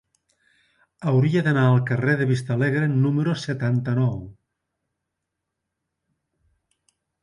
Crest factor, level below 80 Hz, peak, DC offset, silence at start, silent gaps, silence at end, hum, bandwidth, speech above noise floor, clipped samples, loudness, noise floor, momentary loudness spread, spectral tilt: 16 dB; -58 dBFS; -8 dBFS; under 0.1%; 1 s; none; 2.9 s; none; 11 kHz; 61 dB; under 0.1%; -22 LUFS; -82 dBFS; 6 LU; -8 dB/octave